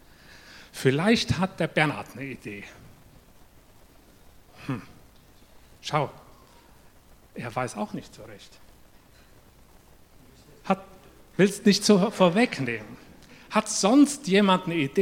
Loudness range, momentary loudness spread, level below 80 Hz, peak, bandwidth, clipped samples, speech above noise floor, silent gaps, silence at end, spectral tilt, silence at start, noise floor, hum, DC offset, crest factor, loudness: 17 LU; 23 LU; -58 dBFS; -4 dBFS; 16.5 kHz; under 0.1%; 30 dB; none; 0 s; -5 dB/octave; 0.55 s; -54 dBFS; none; under 0.1%; 22 dB; -24 LUFS